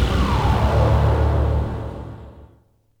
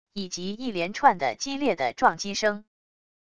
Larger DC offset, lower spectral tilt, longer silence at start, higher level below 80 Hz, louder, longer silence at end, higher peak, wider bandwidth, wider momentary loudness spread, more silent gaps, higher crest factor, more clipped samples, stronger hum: second, under 0.1% vs 0.4%; first, -7.5 dB/octave vs -3.5 dB/octave; about the same, 0 s vs 0.05 s; first, -24 dBFS vs -62 dBFS; first, -19 LUFS vs -26 LUFS; second, 0.55 s vs 0.7 s; about the same, -6 dBFS vs -6 dBFS; about the same, 10 kHz vs 10.5 kHz; first, 17 LU vs 11 LU; neither; second, 14 dB vs 22 dB; neither; neither